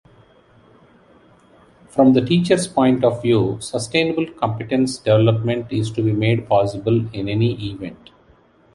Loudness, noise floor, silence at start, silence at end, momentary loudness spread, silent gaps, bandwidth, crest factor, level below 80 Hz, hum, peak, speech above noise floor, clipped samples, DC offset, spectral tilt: -19 LUFS; -53 dBFS; 1.95 s; 0.8 s; 8 LU; none; 11.5 kHz; 18 dB; -50 dBFS; none; -2 dBFS; 35 dB; under 0.1%; under 0.1%; -6.5 dB/octave